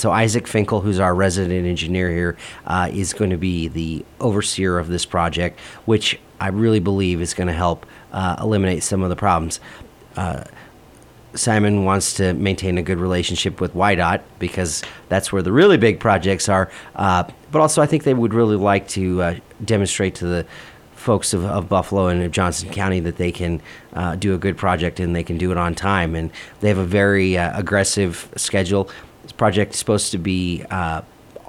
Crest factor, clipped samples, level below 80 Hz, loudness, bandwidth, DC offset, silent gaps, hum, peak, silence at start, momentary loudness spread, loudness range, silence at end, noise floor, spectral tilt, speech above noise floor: 18 dB; under 0.1%; -40 dBFS; -19 LUFS; 15.5 kHz; under 0.1%; none; none; -2 dBFS; 0 s; 10 LU; 4 LU; 0.1 s; -46 dBFS; -5 dB/octave; 27 dB